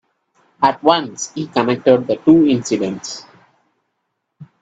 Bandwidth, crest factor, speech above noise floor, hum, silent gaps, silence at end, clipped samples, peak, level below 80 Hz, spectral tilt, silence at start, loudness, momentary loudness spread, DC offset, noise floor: 8 kHz; 18 dB; 58 dB; none; none; 0.2 s; under 0.1%; 0 dBFS; -58 dBFS; -5 dB/octave; 0.6 s; -16 LUFS; 14 LU; under 0.1%; -73 dBFS